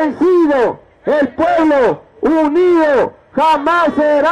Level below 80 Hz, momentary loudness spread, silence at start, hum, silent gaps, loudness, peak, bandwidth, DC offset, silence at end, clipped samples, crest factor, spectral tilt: -46 dBFS; 6 LU; 0 s; none; none; -13 LUFS; -6 dBFS; 10 kHz; under 0.1%; 0 s; under 0.1%; 8 dB; -6 dB/octave